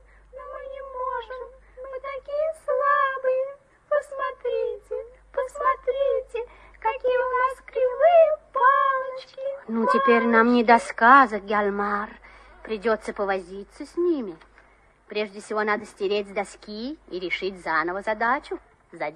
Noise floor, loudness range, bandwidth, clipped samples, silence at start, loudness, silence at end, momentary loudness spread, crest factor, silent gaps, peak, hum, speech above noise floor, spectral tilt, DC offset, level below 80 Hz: -57 dBFS; 9 LU; 10.5 kHz; under 0.1%; 0.35 s; -23 LUFS; 0 s; 18 LU; 22 dB; none; -2 dBFS; none; 34 dB; -5 dB/octave; under 0.1%; -56 dBFS